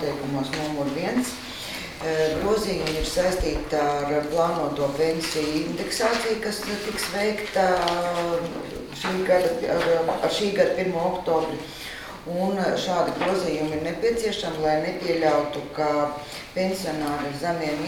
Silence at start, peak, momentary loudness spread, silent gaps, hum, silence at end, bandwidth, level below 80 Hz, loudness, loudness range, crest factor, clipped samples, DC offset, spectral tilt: 0 s; -6 dBFS; 9 LU; none; none; 0 s; 19 kHz; -44 dBFS; -25 LUFS; 2 LU; 18 dB; under 0.1%; under 0.1%; -4.5 dB/octave